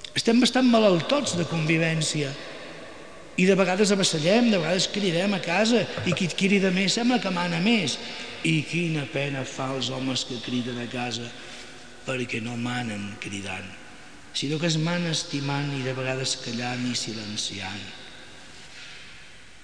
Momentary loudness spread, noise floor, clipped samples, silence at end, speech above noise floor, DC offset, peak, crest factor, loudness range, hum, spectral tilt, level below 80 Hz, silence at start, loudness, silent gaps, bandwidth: 20 LU; -48 dBFS; under 0.1%; 0.2 s; 23 dB; 0.5%; -8 dBFS; 18 dB; 9 LU; none; -4.5 dB/octave; -60 dBFS; 0 s; -25 LUFS; none; 10.5 kHz